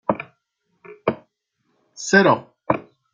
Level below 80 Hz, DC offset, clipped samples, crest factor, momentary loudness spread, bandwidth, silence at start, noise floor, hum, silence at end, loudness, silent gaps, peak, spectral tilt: -62 dBFS; under 0.1%; under 0.1%; 22 dB; 18 LU; 9.4 kHz; 0.1 s; -71 dBFS; none; 0.35 s; -21 LUFS; none; -2 dBFS; -4.5 dB/octave